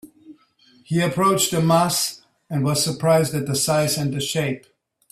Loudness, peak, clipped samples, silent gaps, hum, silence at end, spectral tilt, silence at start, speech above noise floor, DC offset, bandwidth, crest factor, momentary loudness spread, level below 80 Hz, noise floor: -20 LUFS; -4 dBFS; under 0.1%; none; none; 0.55 s; -4.5 dB/octave; 0.05 s; 36 dB; under 0.1%; 16 kHz; 18 dB; 8 LU; -58 dBFS; -56 dBFS